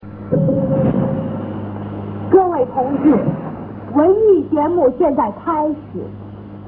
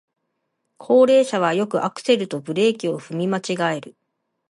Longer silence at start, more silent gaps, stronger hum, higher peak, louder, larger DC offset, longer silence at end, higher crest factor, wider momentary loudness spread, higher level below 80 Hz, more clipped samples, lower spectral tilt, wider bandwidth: second, 0 s vs 0.8 s; neither; neither; first, 0 dBFS vs -4 dBFS; first, -17 LUFS vs -20 LUFS; neither; second, 0 s vs 0.6 s; about the same, 16 dB vs 16 dB; first, 15 LU vs 11 LU; first, -44 dBFS vs -74 dBFS; neither; first, -13.5 dB/octave vs -5.5 dB/octave; second, 3.6 kHz vs 11.5 kHz